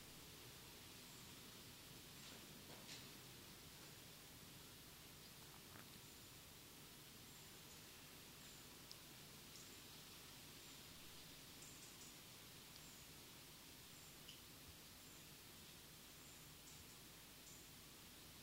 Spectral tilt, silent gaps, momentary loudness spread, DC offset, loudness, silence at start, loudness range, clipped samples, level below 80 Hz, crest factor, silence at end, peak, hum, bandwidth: -2.5 dB/octave; none; 2 LU; under 0.1%; -59 LUFS; 0 s; 1 LU; under 0.1%; -76 dBFS; 24 dB; 0 s; -36 dBFS; none; 16 kHz